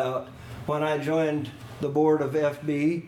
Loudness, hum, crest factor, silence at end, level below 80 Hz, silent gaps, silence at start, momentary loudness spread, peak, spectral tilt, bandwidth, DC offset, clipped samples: -26 LUFS; none; 14 dB; 0 s; -58 dBFS; none; 0 s; 13 LU; -12 dBFS; -7.5 dB/octave; 15 kHz; under 0.1%; under 0.1%